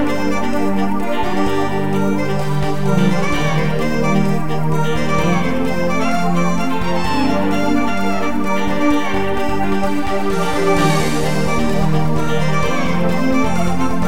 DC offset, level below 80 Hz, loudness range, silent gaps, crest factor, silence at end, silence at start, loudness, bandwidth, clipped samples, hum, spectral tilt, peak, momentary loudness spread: 10%; -34 dBFS; 1 LU; none; 14 dB; 0 s; 0 s; -18 LUFS; 17 kHz; under 0.1%; none; -6 dB/octave; -2 dBFS; 3 LU